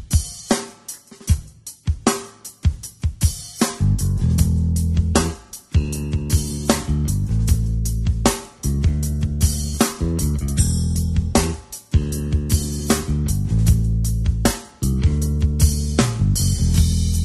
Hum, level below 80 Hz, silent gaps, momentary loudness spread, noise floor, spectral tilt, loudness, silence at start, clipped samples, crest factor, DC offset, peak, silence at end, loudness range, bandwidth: none; -24 dBFS; none; 7 LU; -39 dBFS; -5 dB/octave; -21 LUFS; 0 s; under 0.1%; 18 dB; under 0.1%; 0 dBFS; 0 s; 3 LU; 13 kHz